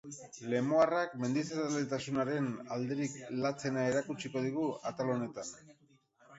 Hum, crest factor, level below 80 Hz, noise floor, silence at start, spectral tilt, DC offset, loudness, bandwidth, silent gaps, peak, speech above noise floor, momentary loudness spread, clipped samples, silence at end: none; 20 dB; -74 dBFS; -66 dBFS; 0.05 s; -5.5 dB/octave; under 0.1%; -35 LUFS; 8 kHz; none; -16 dBFS; 31 dB; 10 LU; under 0.1%; 0 s